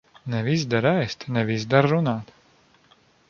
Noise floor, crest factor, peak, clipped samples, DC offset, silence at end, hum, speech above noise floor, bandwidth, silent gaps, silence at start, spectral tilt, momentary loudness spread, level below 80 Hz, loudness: -59 dBFS; 22 dB; -2 dBFS; under 0.1%; under 0.1%; 1.05 s; none; 36 dB; 7.2 kHz; none; 0.25 s; -6.5 dB/octave; 8 LU; -60 dBFS; -23 LUFS